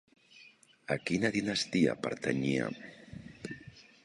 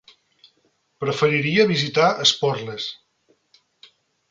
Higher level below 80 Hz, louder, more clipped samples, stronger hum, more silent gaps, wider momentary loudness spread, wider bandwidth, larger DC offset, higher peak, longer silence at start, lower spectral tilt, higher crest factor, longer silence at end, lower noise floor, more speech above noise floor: about the same, -64 dBFS vs -64 dBFS; second, -32 LUFS vs -20 LUFS; neither; neither; neither; first, 20 LU vs 13 LU; first, 11.5 kHz vs 9 kHz; neither; second, -14 dBFS vs -4 dBFS; second, 0.35 s vs 1 s; about the same, -5 dB/octave vs -4 dB/octave; about the same, 20 dB vs 20 dB; second, 0.25 s vs 1.35 s; second, -60 dBFS vs -66 dBFS; second, 28 dB vs 46 dB